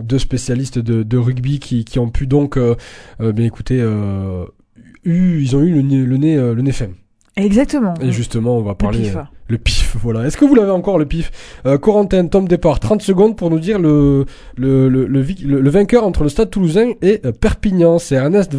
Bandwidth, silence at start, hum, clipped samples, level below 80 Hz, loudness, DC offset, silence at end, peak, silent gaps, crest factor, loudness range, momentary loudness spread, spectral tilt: 11 kHz; 0 s; none; under 0.1%; -28 dBFS; -15 LUFS; under 0.1%; 0 s; 0 dBFS; none; 14 dB; 4 LU; 9 LU; -7.5 dB/octave